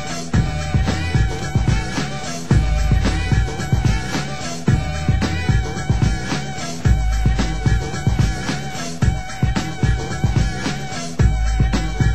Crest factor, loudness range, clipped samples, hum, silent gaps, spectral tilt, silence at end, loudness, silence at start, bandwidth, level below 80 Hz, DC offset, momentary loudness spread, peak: 16 dB; 1 LU; under 0.1%; none; none; -5.5 dB/octave; 0 s; -20 LUFS; 0 s; 13 kHz; -22 dBFS; 3%; 5 LU; -4 dBFS